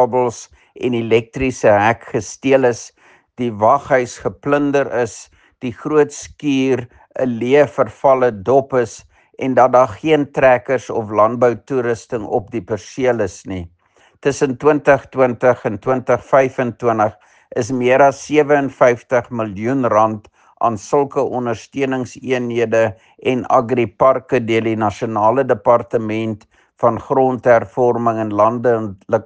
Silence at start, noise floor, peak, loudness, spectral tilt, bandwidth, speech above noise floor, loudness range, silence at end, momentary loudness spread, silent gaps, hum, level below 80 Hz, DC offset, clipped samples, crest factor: 0 s; -53 dBFS; 0 dBFS; -16 LUFS; -6 dB/octave; 9.6 kHz; 38 dB; 3 LU; 0.05 s; 11 LU; none; none; -52 dBFS; under 0.1%; under 0.1%; 16 dB